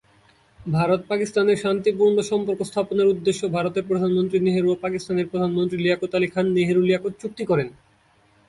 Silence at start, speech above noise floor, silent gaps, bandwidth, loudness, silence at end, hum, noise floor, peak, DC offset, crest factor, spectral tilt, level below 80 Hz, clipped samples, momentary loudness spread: 0.6 s; 38 dB; none; 11.5 kHz; -22 LUFS; 0.75 s; none; -59 dBFS; -8 dBFS; under 0.1%; 14 dB; -6.5 dB/octave; -58 dBFS; under 0.1%; 6 LU